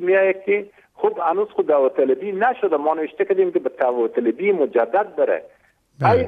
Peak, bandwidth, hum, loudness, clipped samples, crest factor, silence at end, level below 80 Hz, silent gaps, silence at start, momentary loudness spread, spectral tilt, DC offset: -4 dBFS; 4.9 kHz; none; -20 LUFS; under 0.1%; 16 dB; 0 s; -60 dBFS; none; 0 s; 5 LU; -9 dB/octave; under 0.1%